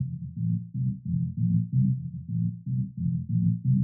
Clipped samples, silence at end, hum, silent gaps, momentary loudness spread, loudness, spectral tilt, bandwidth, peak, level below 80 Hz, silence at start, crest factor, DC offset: under 0.1%; 0 s; none; none; 7 LU; -28 LUFS; -29.5 dB/octave; 0.4 kHz; -14 dBFS; -52 dBFS; 0 s; 12 dB; under 0.1%